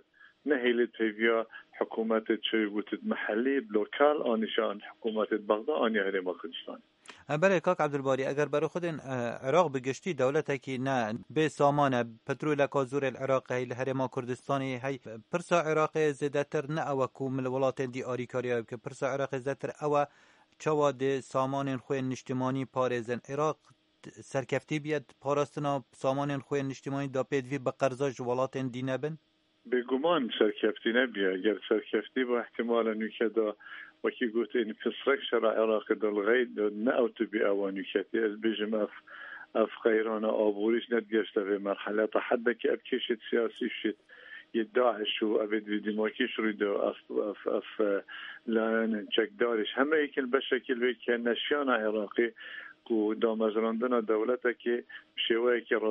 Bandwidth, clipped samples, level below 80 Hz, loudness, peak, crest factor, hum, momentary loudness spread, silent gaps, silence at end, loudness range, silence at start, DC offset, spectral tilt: 10.5 kHz; under 0.1%; -78 dBFS; -31 LUFS; -10 dBFS; 20 dB; none; 8 LU; none; 0 s; 3 LU; 0.45 s; under 0.1%; -6 dB/octave